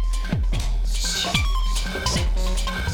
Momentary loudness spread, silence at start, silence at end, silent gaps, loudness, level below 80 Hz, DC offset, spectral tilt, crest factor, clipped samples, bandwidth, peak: 5 LU; 0 s; 0 s; none; -24 LUFS; -22 dBFS; under 0.1%; -3.5 dB/octave; 16 dB; under 0.1%; 17 kHz; -4 dBFS